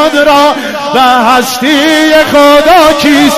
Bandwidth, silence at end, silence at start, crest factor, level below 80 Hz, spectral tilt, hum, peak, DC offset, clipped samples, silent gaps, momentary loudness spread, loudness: 16 kHz; 0 s; 0 s; 6 dB; -34 dBFS; -3 dB/octave; none; 0 dBFS; under 0.1%; 2%; none; 5 LU; -5 LUFS